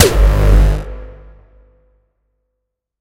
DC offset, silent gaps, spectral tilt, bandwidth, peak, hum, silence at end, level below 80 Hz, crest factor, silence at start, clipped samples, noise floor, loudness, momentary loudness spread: under 0.1%; none; -5 dB/octave; 16 kHz; 0 dBFS; 50 Hz at -30 dBFS; 1.9 s; -16 dBFS; 14 dB; 0 s; 0.1%; -75 dBFS; -13 LUFS; 20 LU